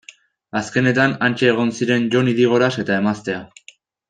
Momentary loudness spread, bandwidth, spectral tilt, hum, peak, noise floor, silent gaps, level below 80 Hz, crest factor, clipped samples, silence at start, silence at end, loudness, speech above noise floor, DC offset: 10 LU; 9.4 kHz; -6 dB/octave; none; -2 dBFS; -49 dBFS; none; -60 dBFS; 16 dB; under 0.1%; 0.55 s; 0.65 s; -18 LUFS; 32 dB; under 0.1%